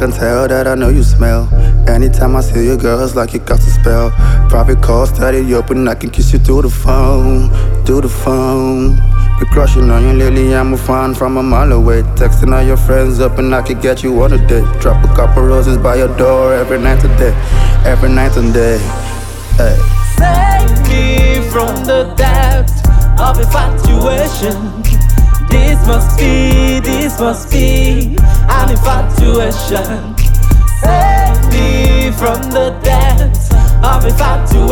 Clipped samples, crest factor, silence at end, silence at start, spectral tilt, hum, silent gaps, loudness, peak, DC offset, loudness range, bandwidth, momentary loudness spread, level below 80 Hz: 0.3%; 8 dB; 0 s; 0 s; -6.5 dB/octave; none; none; -11 LUFS; 0 dBFS; under 0.1%; 1 LU; 18 kHz; 4 LU; -10 dBFS